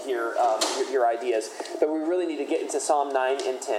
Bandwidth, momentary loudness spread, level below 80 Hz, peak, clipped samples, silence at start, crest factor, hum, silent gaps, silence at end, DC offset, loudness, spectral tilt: 16 kHz; 5 LU; under -90 dBFS; -8 dBFS; under 0.1%; 0 s; 16 dB; none; none; 0 s; under 0.1%; -26 LUFS; -0.5 dB/octave